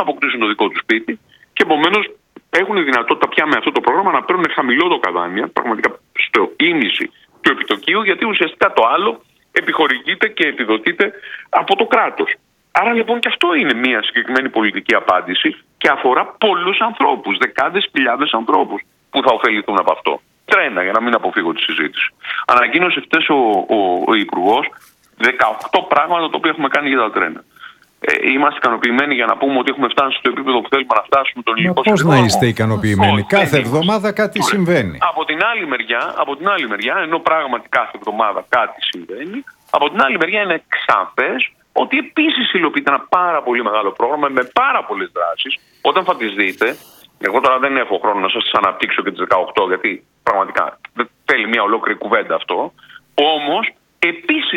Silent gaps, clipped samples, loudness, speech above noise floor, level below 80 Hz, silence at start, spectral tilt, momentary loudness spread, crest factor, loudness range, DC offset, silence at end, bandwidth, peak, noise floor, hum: none; under 0.1%; -15 LUFS; 25 dB; -56 dBFS; 0 s; -5 dB/octave; 6 LU; 16 dB; 3 LU; under 0.1%; 0 s; 16.5 kHz; 0 dBFS; -41 dBFS; none